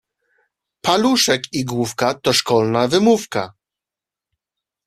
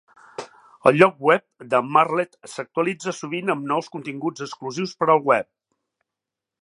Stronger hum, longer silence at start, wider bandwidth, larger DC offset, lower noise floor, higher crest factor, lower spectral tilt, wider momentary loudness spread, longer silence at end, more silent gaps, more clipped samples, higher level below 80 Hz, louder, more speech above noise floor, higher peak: neither; first, 0.85 s vs 0.4 s; first, 14.5 kHz vs 11.5 kHz; neither; about the same, -88 dBFS vs -86 dBFS; about the same, 18 dB vs 22 dB; second, -4 dB/octave vs -5.5 dB/octave; second, 10 LU vs 17 LU; first, 1.35 s vs 1.2 s; neither; neither; first, -56 dBFS vs -72 dBFS; first, -17 LUFS vs -21 LUFS; first, 71 dB vs 65 dB; about the same, -2 dBFS vs 0 dBFS